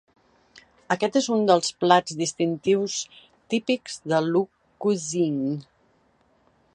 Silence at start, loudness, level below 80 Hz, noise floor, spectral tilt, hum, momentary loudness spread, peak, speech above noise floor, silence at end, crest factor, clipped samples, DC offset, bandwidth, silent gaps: 0.55 s; -24 LUFS; -72 dBFS; -64 dBFS; -4.5 dB/octave; none; 9 LU; -2 dBFS; 41 dB; 1.15 s; 22 dB; under 0.1%; under 0.1%; 11 kHz; none